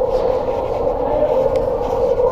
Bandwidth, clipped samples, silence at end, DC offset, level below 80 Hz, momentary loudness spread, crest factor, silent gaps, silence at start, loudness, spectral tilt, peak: 7.6 kHz; under 0.1%; 0 s; under 0.1%; -32 dBFS; 4 LU; 12 dB; none; 0 s; -18 LUFS; -7.5 dB/octave; -4 dBFS